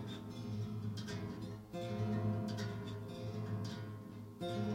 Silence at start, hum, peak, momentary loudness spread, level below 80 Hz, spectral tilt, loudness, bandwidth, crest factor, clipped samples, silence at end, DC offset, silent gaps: 0 s; none; -28 dBFS; 9 LU; -66 dBFS; -7 dB/octave; -43 LUFS; 15.5 kHz; 14 dB; under 0.1%; 0 s; under 0.1%; none